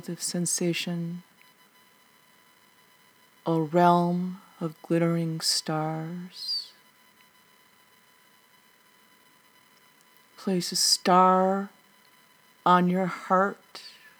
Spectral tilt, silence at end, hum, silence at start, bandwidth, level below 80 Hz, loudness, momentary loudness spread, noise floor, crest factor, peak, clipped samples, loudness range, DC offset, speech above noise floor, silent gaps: -4 dB/octave; 0.3 s; none; 0.05 s; over 20 kHz; under -90 dBFS; -25 LUFS; 16 LU; -60 dBFS; 22 dB; -6 dBFS; under 0.1%; 12 LU; under 0.1%; 35 dB; none